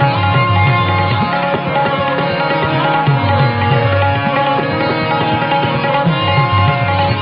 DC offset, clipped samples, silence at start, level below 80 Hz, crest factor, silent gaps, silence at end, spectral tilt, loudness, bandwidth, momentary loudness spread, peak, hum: under 0.1%; under 0.1%; 0 s; -42 dBFS; 12 dB; none; 0 s; -4.5 dB/octave; -14 LUFS; 5.4 kHz; 3 LU; -2 dBFS; none